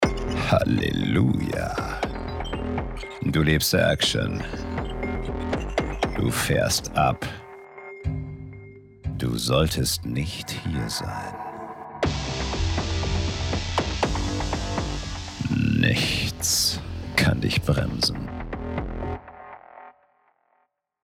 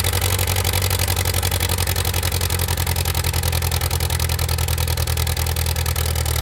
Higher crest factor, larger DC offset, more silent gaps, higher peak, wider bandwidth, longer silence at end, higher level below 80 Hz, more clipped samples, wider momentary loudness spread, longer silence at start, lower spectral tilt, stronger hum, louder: about the same, 20 dB vs 16 dB; neither; neither; about the same, -4 dBFS vs -4 dBFS; about the same, 17 kHz vs 17.5 kHz; first, 1.15 s vs 0 s; second, -36 dBFS vs -28 dBFS; neither; first, 14 LU vs 2 LU; about the same, 0 s vs 0 s; first, -4.5 dB/octave vs -3 dB/octave; neither; second, -25 LUFS vs -20 LUFS